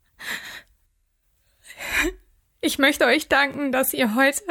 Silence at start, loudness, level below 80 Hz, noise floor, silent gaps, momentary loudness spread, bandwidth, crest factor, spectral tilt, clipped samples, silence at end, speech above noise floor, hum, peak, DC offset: 0.2 s; -21 LUFS; -48 dBFS; -68 dBFS; none; 14 LU; 19 kHz; 18 dB; -2.5 dB/octave; under 0.1%; 0 s; 47 dB; none; -6 dBFS; under 0.1%